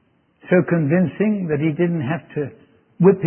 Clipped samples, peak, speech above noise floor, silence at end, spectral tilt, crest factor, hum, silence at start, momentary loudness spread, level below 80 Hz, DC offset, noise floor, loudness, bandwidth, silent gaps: under 0.1%; -2 dBFS; 29 dB; 0 s; -13.5 dB/octave; 18 dB; none; 0.45 s; 10 LU; -60 dBFS; under 0.1%; -47 dBFS; -20 LUFS; 3.3 kHz; none